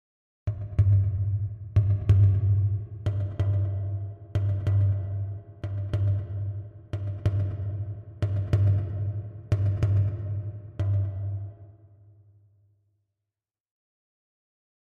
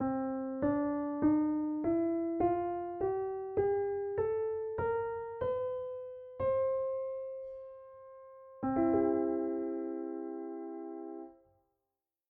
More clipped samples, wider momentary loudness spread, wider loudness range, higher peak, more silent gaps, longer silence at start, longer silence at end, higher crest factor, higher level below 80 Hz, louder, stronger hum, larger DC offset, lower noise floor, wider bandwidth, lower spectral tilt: neither; second, 13 LU vs 16 LU; first, 9 LU vs 4 LU; first, -10 dBFS vs -18 dBFS; neither; first, 0.45 s vs 0 s; first, 3.2 s vs 0.95 s; about the same, 18 dB vs 16 dB; first, -44 dBFS vs -62 dBFS; first, -28 LUFS vs -34 LUFS; neither; neither; about the same, -90 dBFS vs -89 dBFS; about the same, 3.4 kHz vs 3.4 kHz; about the same, -9.5 dB/octave vs -8.5 dB/octave